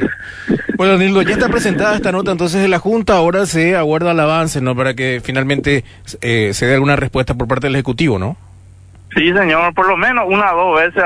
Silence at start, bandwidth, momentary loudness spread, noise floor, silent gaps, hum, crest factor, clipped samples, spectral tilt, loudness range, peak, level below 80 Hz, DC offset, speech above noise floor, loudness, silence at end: 0 s; 11 kHz; 6 LU; -40 dBFS; none; none; 12 dB; under 0.1%; -5.5 dB/octave; 2 LU; -2 dBFS; -36 dBFS; under 0.1%; 26 dB; -14 LUFS; 0 s